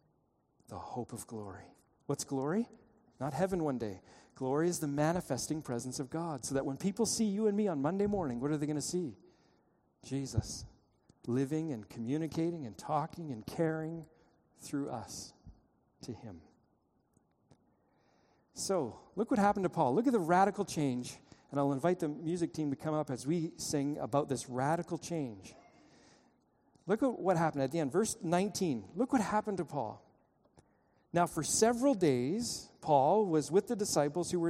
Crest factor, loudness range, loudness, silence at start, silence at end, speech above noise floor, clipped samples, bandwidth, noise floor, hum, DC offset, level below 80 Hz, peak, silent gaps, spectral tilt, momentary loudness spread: 20 dB; 9 LU; -34 LUFS; 0.7 s; 0 s; 41 dB; under 0.1%; 15.5 kHz; -75 dBFS; none; under 0.1%; -64 dBFS; -14 dBFS; none; -5.5 dB/octave; 14 LU